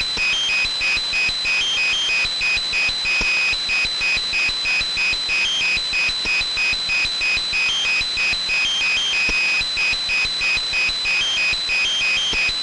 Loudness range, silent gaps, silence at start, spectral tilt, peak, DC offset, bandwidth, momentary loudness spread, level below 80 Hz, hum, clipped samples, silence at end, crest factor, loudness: 0 LU; none; 0 s; 0.5 dB/octave; -12 dBFS; under 0.1%; 11.5 kHz; 2 LU; -42 dBFS; none; under 0.1%; 0 s; 8 dB; -17 LUFS